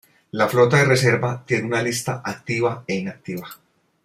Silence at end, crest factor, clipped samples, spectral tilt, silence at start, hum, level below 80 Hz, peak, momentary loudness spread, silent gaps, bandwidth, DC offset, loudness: 0.5 s; 18 dB; under 0.1%; -5 dB/octave; 0.35 s; none; -60 dBFS; -4 dBFS; 17 LU; none; 16 kHz; under 0.1%; -20 LUFS